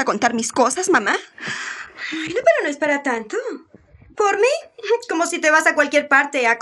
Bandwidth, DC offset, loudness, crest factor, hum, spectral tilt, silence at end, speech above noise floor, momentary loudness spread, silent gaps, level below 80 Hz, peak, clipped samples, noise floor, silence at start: 13 kHz; under 0.1%; -19 LUFS; 18 dB; none; -2 dB/octave; 0 s; 28 dB; 13 LU; none; -64 dBFS; -2 dBFS; under 0.1%; -47 dBFS; 0 s